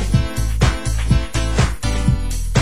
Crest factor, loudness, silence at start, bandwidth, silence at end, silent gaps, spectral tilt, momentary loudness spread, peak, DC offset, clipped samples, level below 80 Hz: 16 dB; -19 LUFS; 0 s; 16 kHz; 0 s; none; -5.5 dB/octave; 4 LU; -2 dBFS; 3%; under 0.1%; -20 dBFS